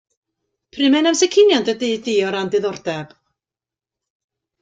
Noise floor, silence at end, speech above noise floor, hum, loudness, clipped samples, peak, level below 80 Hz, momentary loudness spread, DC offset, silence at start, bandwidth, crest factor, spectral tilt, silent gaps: -90 dBFS; 1.55 s; 73 dB; none; -17 LUFS; under 0.1%; -4 dBFS; -64 dBFS; 12 LU; under 0.1%; 0.75 s; 9.2 kHz; 16 dB; -3.5 dB/octave; none